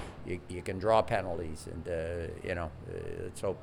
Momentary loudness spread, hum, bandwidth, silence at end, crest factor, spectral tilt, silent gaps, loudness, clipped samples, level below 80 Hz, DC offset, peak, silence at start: 13 LU; none; 16.5 kHz; 0 s; 22 dB; -6 dB/octave; none; -35 LUFS; under 0.1%; -50 dBFS; under 0.1%; -12 dBFS; 0 s